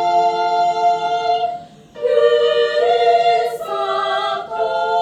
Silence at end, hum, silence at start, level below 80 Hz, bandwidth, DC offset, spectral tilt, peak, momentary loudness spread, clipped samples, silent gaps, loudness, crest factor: 0 s; none; 0 s; -64 dBFS; 12.5 kHz; under 0.1%; -3 dB/octave; -2 dBFS; 8 LU; under 0.1%; none; -17 LUFS; 14 dB